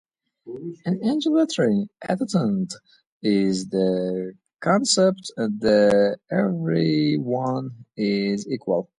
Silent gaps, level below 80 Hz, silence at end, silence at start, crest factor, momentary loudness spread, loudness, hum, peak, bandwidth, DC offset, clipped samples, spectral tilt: 3.07-3.21 s; -62 dBFS; 0.15 s; 0.45 s; 16 dB; 12 LU; -22 LUFS; none; -6 dBFS; 11.5 kHz; under 0.1%; under 0.1%; -5.5 dB/octave